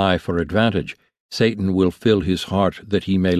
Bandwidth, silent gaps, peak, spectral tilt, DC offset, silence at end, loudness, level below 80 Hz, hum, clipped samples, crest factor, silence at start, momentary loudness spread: 13.5 kHz; 1.20-1.29 s; -4 dBFS; -6.5 dB/octave; under 0.1%; 0 s; -20 LUFS; -38 dBFS; none; under 0.1%; 16 dB; 0 s; 6 LU